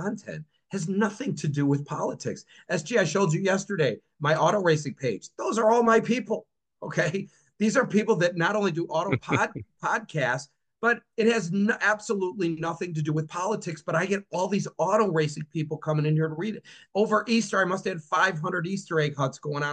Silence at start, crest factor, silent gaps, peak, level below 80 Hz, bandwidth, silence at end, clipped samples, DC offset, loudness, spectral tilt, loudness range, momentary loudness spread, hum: 0 s; 18 dB; none; -8 dBFS; -70 dBFS; 9.4 kHz; 0 s; under 0.1%; under 0.1%; -26 LUFS; -5.5 dB/octave; 3 LU; 10 LU; none